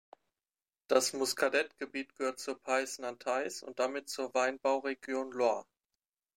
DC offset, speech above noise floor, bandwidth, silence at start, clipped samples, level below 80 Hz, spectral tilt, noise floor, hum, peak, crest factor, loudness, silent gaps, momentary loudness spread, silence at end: under 0.1%; over 56 dB; 16 kHz; 0.9 s; under 0.1%; -86 dBFS; -1.5 dB/octave; under -90 dBFS; none; -12 dBFS; 22 dB; -34 LUFS; none; 9 LU; 0.75 s